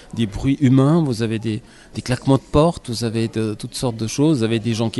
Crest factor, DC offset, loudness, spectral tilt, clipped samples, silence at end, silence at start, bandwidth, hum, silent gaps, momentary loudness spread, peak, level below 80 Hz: 16 dB; under 0.1%; -19 LUFS; -6.5 dB/octave; under 0.1%; 0 s; 0.15 s; 12 kHz; none; none; 10 LU; -4 dBFS; -40 dBFS